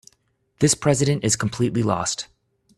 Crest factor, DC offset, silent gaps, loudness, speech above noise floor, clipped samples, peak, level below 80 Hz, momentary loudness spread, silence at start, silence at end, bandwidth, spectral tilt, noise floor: 18 dB; under 0.1%; none; -21 LUFS; 46 dB; under 0.1%; -4 dBFS; -52 dBFS; 8 LU; 0.6 s; 0.55 s; 13.5 kHz; -4.5 dB/octave; -66 dBFS